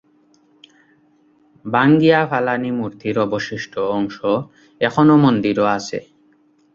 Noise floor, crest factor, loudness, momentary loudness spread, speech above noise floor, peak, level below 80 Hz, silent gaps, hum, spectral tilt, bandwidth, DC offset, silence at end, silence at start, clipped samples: -56 dBFS; 18 dB; -17 LUFS; 12 LU; 39 dB; -2 dBFS; -58 dBFS; none; none; -7 dB/octave; 7.4 kHz; under 0.1%; 0.75 s; 1.65 s; under 0.1%